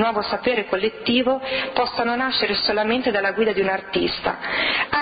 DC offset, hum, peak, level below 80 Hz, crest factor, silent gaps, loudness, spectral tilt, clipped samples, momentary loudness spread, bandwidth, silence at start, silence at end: under 0.1%; none; -6 dBFS; -52 dBFS; 16 dB; none; -21 LUFS; -8 dB/octave; under 0.1%; 3 LU; 5.2 kHz; 0 s; 0 s